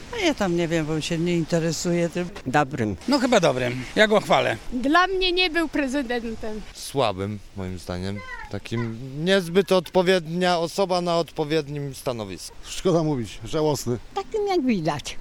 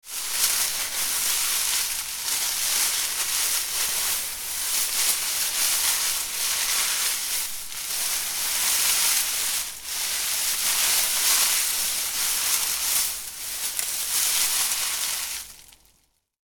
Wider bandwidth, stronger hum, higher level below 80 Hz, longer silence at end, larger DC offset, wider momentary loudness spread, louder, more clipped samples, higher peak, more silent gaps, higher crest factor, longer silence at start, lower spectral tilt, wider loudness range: second, 17 kHz vs 19.5 kHz; neither; first, -44 dBFS vs -56 dBFS; second, 0 s vs 0.85 s; neither; first, 12 LU vs 7 LU; about the same, -23 LUFS vs -22 LUFS; neither; about the same, -2 dBFS vs -2 dBFS; neither; about the same, 22 dB vs 22 dB; about the same, 0 s vs 0.05 s; first, -5 dB/octave vs 3 dB/octave; first, 6 LU vs 2 LU